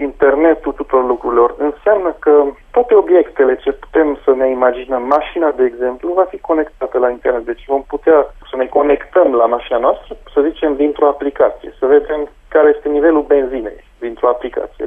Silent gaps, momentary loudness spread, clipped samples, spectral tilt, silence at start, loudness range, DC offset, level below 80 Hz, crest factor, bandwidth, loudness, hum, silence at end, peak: none; 9 LU; under 0.1%; -7 dB/octave; 0 s; 3 LU; under 0.1%; -40 dBFS; 14 dB; 3.7 kHz; -14 LUFS; none; 0 s; 0 dBFS